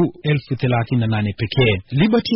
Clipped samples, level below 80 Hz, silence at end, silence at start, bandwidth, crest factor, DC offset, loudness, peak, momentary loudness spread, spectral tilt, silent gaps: under 0.1%; -44 dBFS; 0 s; 0 s; 5.8 kHz; 12 dB; under 0.1%; -19 LUFS; -6 dBFS; 4 LU; -5.5 dB/octave; none